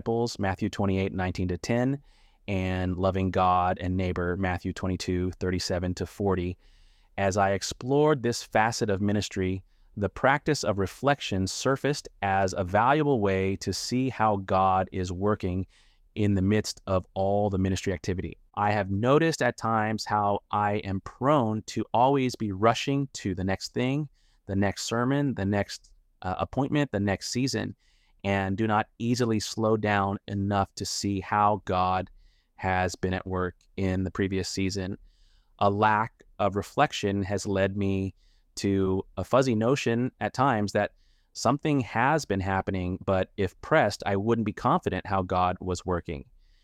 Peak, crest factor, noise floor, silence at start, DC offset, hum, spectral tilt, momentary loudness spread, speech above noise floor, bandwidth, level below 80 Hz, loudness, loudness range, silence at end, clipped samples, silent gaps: -8 dBFS; 20 dB; -60 dBFS; 0.05 s; under 0.1%; none; -5.5 dB/octave; 8 LU; 33 dB; 15 kHz; -54 dBFS; -27 LUFS; 3 LU; 0.4 s; under 0.1%; none